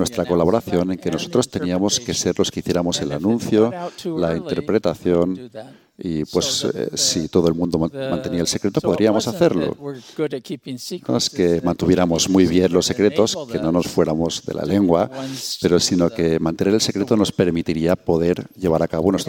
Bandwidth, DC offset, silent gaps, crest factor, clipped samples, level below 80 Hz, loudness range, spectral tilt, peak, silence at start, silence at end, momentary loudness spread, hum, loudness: 17 kHz; under 0.1%; none; 16 dB; under 0.1%; -46 dBFS; 3 LU; -5 dB/octave; -2 dBFS; 0 s; 0 s; 9 LU; none; -19 LUFS